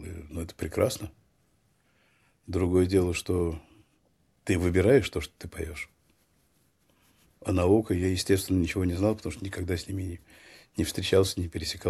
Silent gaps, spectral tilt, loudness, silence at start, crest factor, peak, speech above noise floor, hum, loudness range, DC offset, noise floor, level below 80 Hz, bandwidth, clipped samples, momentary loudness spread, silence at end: none; -6 dB/octave; -28 LUFS; 0 s; 20 dB; -8 dBFS; 42 dB; none; 3 LU; under 0.1%; -69 dBFS; -48 dBFS; 14.5 kHz; under 0.1%; 15 LU; 0 s